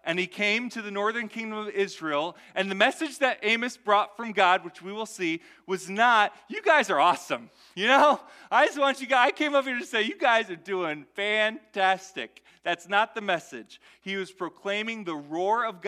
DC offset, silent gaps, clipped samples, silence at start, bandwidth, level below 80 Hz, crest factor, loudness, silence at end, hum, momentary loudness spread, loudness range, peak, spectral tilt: under 0.1%; none; under 0.1%; 0.05 s; 15 kHz; -80 dBFS; 20 dB; -26 LUFS; 0 s; none; 13 LU; 6 LU; -6 dBFS; -3 dB/octave